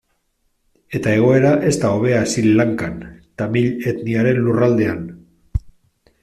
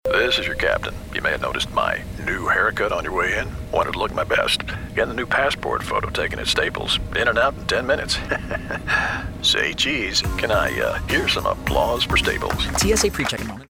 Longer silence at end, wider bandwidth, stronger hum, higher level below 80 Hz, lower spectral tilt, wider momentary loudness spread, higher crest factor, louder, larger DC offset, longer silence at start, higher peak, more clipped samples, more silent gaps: first, 0.55 s vs 0.05 s; second, 13.5 kHz vs 20 kHz; neither; second, -40 dBFS vs -34 dBFS; first, -6.5 dB/octave vs -3 dB/octave; first, 14 LU vs 6 LU; about the same, 14 dB vs 16 dB; first, -17 LUFS vs -21 LUFS; neither; first, 0.9 s vs 0.05 s; about the same, -4 dBFS vs -6 dBFS; neither; neither